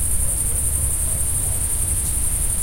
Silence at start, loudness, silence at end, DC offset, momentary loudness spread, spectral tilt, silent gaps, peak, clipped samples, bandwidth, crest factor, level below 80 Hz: 0 s; -19 LUFS; 0 s; under 0.1%; 1 LU; -3 dB/octave; none; -6 dBFS; under 0.1%; 16.5 kHz; 14 dB; -26 dBFS